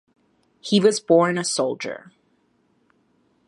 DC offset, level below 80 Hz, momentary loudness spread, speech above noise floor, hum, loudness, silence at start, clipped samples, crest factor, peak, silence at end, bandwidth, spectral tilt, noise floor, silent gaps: under 0.1%; -72 dBFS; 17 LU; 45 dB; none; -20 LUFS; 0.65 s; under 0.1%; 20 dB; -4 dBFS; 1.5 s; 11.5 kHz; -4.5 dB/octave; -65 dBFS; none